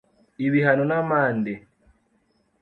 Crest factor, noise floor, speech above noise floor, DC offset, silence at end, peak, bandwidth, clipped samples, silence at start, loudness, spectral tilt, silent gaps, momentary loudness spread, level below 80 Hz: 18 dB; -67 dBFS; 45 dB; under 0.1%; 1.05 s; -6 dBFS; 4.4 kHz; under 0.1%; 0.4 s; -22 LUFS; -10 dB/octave; none; 10 LU; -64 dBFS